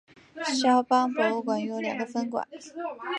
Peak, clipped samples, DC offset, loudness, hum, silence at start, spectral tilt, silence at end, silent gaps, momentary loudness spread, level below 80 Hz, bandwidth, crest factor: -10 dBFS; under 0.1%; under 0.1%; -27 LUFS; none; 0.35 s; -3.5 dB/octave; 0 s; none; 14 LU; -78 dBFS; 10.5 kHz; 18 dB